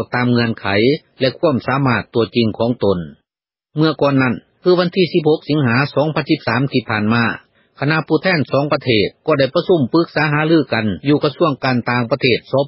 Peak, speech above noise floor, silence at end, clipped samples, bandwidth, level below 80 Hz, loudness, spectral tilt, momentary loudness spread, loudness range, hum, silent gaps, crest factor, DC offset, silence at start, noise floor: 0 dBFS; 73 dB; 0 s; under 0.1%; 5.8 kHz; -48 dBFS; -16 LUFS; -11 dB/octave; 4 LU; 2 LU; none; none; 16 dB; under 0.1%; 0 s; -89 dBFS